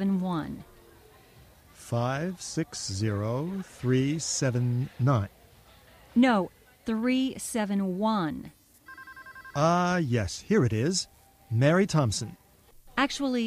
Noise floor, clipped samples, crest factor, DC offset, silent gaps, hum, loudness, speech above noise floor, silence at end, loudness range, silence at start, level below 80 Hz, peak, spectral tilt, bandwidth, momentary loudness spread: -56 dBFS; under 0.1%; 18 dB; under 0.1%; none; none; -28 LUFS; 29 dB; 0 s; 5 LU; 0 s; -56 dBFS; -10 dBFS; -5.5 dB/octave; 15.5 kHz; 16 LU